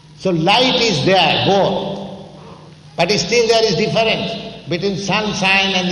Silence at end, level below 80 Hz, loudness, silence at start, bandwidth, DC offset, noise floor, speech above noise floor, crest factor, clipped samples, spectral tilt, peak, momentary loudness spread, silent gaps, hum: 0 s; -48 dBFS; -15 LUFS; 0.1 s; 12 kHz; under 0.1%; -39 dBFS; 24 dB; 14 dB; under 0.1%; -4 dB/octave; -2 dBFS; 13 LU; none; none